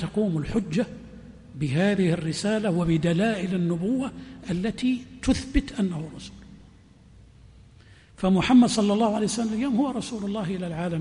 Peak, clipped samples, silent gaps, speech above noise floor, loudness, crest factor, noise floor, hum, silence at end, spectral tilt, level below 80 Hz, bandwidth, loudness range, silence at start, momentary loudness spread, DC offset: -8 dBFS; under 0.1%; none; 28 dB; -25 LUFS; 18 dB; -52 dBFS; none; 0 s; -6 dB/octave; -42 dBFS; 10.5 kHz; 6 LU; 0 s; 12 LU; under 0.1%